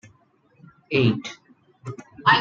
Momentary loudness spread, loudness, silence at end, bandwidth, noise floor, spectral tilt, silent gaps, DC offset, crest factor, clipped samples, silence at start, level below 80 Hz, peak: 20 LU; -22 LUFS; 0 s; 7.8 kHz; -60 dBFS; -6 dB/octave; none; under 0.1%; 20 dB; under 0.1%; 0.9 s; -62 dBFS; -4 dBFS